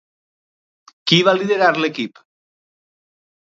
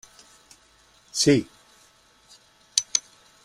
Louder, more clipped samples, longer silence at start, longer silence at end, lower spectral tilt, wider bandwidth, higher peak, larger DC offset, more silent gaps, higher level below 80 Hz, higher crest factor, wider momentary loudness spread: first, -16 LUFS vs -23 LUFS; neither; about the same, 1.05 s vs 1.15 s; first, 1.45 s vs 0.45 s; first, -5 dB/octave vs -3 dB/octave; second, 7.8 kHz vs 15 kHz; about the same, 0 dBFS vs -2 dBFS; neither; neither; second, -70 dBFS vs -62 dBFS; second, 20 dB vs 28 dB; first, 14 LU vs 11 LU